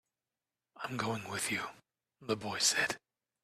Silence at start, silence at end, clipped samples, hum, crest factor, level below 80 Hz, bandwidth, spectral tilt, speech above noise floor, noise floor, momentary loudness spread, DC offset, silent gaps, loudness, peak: 0.75 s; 0.45 s; under 0.1%; none; 22 dB; -74 dBFS; 14.5 kHz; -2 dB/octave; over 55 dB; under -90 dBFS; 16 LU; under 0.1%; none; -34 LUFS; -16 dBFS